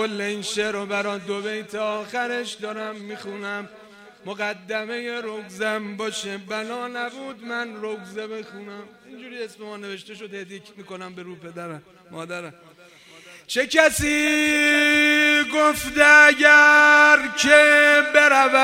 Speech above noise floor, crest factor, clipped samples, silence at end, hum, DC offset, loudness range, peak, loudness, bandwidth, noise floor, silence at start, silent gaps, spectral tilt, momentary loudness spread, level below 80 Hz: 29 dB; 20 dB; under 0.1%; 0 s; none; under 0.1%; 23 LU; 0 dBFS; -17 LUFS; 16 kHz; -49 dBFS; 0 s; none; -2 dB/octave; 24 LU; -54 dBFS